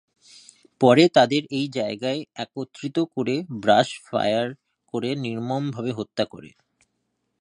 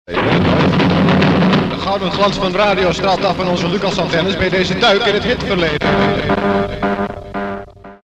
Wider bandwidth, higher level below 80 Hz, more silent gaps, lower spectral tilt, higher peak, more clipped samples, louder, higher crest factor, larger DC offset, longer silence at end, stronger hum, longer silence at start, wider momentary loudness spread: first, 10.5 kHz vs 9 kHz; second, -68 dBFS vs -36 dBFS; neither; about the same, -5.5 dB/octave vs -6 dB/octave; about the same, -2 dBFS vs 0 dBFS; neither; second, -23 LUFS vs -15 LUFS; first, 22 dB vs 14 dB; neither; first, 0.95 s vs 0.1 s; neither; first, 0.8 s vs 0.1 s; first, 14 LU vs 7 LU